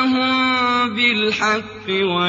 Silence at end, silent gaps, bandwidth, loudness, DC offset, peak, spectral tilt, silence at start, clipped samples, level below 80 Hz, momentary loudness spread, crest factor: 0 s; none; 7.8 kHz; -17 LUFS; under 0.1%; -4 dBFS; -4 dB/octave; 0 s; under 0.1%; -56 dBFS; 5 LU; 14 dB